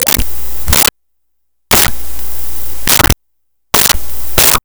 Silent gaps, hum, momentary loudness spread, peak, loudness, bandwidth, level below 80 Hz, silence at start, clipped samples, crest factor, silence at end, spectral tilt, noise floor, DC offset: none; none; 12 LU; 0 dBFS; -11 LUFS; over 20 kHz; -24 dBFS; 0 s; under 0.1%; 12 dB; 0 s; -1.5 dB/octave; -72 dBFS; 10%